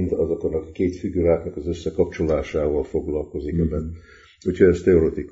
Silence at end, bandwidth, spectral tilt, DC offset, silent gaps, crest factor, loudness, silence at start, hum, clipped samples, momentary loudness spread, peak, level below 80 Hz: 0 s; 7.8 kHz; -8.5 dB/octave; under 0.1%; none; 18 dB; -22 LUFS; 0 s; none; under 0.1%; 11 LU; -4 dBFS; -36 dBFS